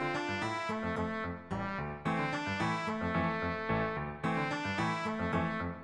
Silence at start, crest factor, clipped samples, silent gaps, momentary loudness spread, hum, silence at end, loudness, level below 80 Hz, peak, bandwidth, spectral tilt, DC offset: 0 s; 16 dB; under 0.1%; none; 4 LU; none; 0 s; -35 LUFS; -56 dBFS; -18 dBFS; 11 kHz; -6 dB/octave; under 0.1%